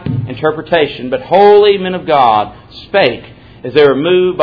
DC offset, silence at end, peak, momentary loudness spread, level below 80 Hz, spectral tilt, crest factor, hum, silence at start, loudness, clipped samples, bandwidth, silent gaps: under 0.1%; 0 s; 0 dBFS; 13 LU; -44 dBFS; -8 dB/octave; 12 dB; none; 0 s; -11 LUFS; 0.6%; 5.4 kHz; none